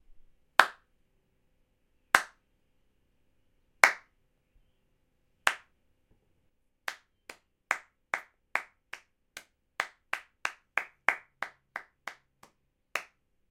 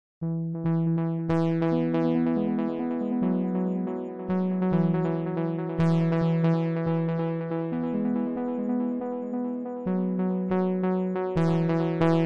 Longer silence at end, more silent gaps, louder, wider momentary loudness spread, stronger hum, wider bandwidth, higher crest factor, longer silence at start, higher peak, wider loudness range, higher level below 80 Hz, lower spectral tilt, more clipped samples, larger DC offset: first, 0.45 s vs 0 s; neither; second, -31 LUFS vs -27 LUFS; first, 23 LU vs 6 LU; neither; first, 16.5 kHz vs 5.6 kHz; first, 34 dB vs 16 dB; first, 0.6 s vs 0.2 s; first, -2 dBFS vs -8 dBFS; first, 8 LU vs 3 LU; second, -72 dBFS vs -60 dBFS; second, 0 dB/octave vs -10 dB/octave; neither; second, under 0.1% vs 0.1%